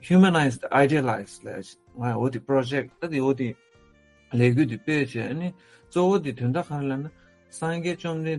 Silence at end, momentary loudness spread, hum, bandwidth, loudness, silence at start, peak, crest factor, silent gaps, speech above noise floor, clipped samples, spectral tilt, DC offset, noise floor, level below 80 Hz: 0 s; 14 LU; none; 11.5 kHz; -25 LUFS; 0.05 s; -6 dBFS; 18 dB; none; 33 dB; under 0.1%; -7 dB/octave; under 0.1%; -57 dBFS; -62 dBFS